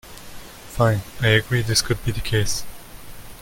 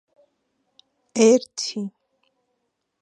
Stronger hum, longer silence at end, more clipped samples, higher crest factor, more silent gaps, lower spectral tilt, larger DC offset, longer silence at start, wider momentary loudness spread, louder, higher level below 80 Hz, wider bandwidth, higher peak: neither; second, 0 s vs 1.15 s; neither; about the same, 18 dB vs 22 dB; neither; about the same, -4 dB/octave vs -4 dB/octave; neither; second, 0.05 s vs 1.15 s; first, 22 LU vs 16 LU; about the same, -21 LUFS vs -21 LUFS; first, -38 dBFS vs -82 dBFS; first, 17 kHz vs 10.5 kHz; about the same, -4 dBFS vs -4 dBFS